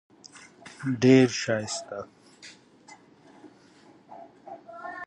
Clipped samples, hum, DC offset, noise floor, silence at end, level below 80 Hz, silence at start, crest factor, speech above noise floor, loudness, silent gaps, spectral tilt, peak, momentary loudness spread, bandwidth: under 0.1%; none; under 0.1%; -56 dBFS; 0 s; -72 dBFS; 0.35 s; 22 dB; 33 dB; -24 LUFS; none; -5.5 dB/octave; -6 dBFS; 29 LU; 10 kHz